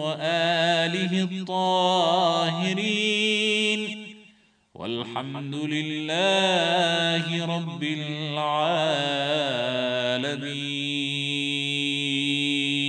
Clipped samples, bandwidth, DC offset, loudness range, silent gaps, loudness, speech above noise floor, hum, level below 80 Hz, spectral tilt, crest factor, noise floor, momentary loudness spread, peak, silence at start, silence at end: under 0.1%; 10 kHz; under 0.1%; 3 LU; none; -24 LUFS; 34 dB; none; -76 dBFS; -4 dB/octave; 16 dB; -58 dBFS; 9 LU; -8 dBFS; 0 s; 0 s